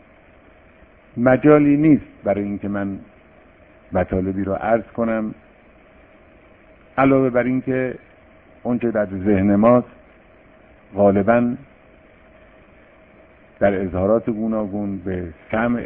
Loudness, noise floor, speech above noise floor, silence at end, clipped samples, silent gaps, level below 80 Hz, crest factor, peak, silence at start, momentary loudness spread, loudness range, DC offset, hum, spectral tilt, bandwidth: -19 LUFS; -49 dBFS; 31 dB; 0 s; under 0.1%; none; -48 dBFS; 20 dB; 0 dBFS; 1.15 s; 14 LU; 6 LU; under 0.1%; none; -12.5 dB/octave; 3.6 kHz